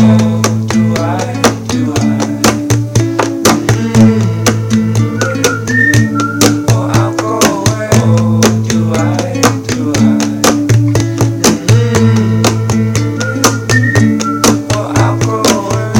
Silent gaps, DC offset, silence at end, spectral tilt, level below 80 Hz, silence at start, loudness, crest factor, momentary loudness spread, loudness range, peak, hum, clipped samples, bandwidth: none; under 0.1%; 0 s; -5 dB/octave; -36 dBFS; 0 s; -11 LUFS; 10 dB; 5 LU; 1 LU; 0 dBFS; none; 0.6%; 17.5 kHz